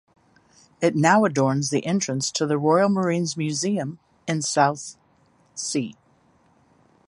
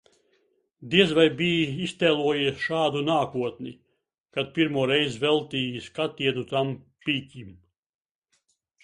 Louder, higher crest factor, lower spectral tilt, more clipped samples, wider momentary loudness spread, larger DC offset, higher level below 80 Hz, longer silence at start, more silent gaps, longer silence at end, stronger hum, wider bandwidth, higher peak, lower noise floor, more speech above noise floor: first, -22 LUFS vs -25 LUFS; about the same, 20 dB vs 22 dB; about the same, -4.5 dB/octave vs -5.5 dB/octave; neither; first, 16 LU vs 11 LU; neither; about the same, -66 dBFS vs -62 dBFS; about the same, 0.8 s vs 0.8 s; second, none vs 4.20-4.24 s; second, 1.15 s vs 1.3 s; neither; about the same, 11.5 kHz vs 11.5 kHz; about the same, -4 dBFS vs -4 dBFS; second, -60 dBFS vs -72 dBFS; second, 39 dB vs 47 dB